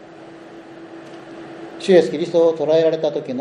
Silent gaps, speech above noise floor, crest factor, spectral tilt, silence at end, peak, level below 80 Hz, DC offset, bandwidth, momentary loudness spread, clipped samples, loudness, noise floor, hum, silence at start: none; 23 dB; 18 dB; -6 dB/octave; 0 s; -2 dBFS; -70 dBFS; under 0.1%; 10 kHz; 24 LU; under 0.1%; -17 LUFS; -39 dBFS; none; 0 s